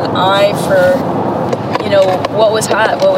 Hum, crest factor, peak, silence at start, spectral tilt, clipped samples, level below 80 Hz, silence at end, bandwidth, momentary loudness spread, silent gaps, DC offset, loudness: none; 12 dB; 0 dBFS; 0 s; -5 dB/octave; under 0.1%; -50 dBFS; 0 s; 16 kHz; 5 LU; none; under 0.1%; -12 LUFS